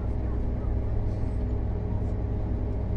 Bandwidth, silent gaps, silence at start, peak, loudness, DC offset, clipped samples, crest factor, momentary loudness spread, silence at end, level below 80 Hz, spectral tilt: 4.3 kHz; none; 0 s; -16 dBFS; -31 LUFS; under 0.1%; under 0.1%; 10 dB; 1 LU; 0 s; -30 dBFS; -10.5 dB/octave